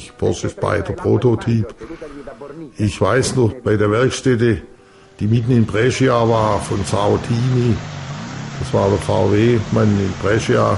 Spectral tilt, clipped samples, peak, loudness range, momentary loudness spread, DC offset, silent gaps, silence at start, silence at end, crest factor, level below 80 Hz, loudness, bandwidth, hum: -6.5 dB/octave; under 0.1%; -2 dBFS; 2 LU; 13 LU; under 0.1%; none; 0 s; 0 s; 14 dB; -40 dBFS; -17 LUFS; 11.5 kHz; none